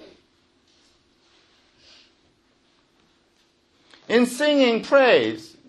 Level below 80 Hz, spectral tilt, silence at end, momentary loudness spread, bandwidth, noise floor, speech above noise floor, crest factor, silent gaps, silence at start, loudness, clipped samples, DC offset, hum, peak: -72 dBFS; -4 dB/octave; 0.2 s; 6 LU; 12 kHz; -63 dBFS; 45 dB; 20 dB; none; 4.1 s; -19 LUFS; under 0.1%; under 0.1%; none; -6 dBFS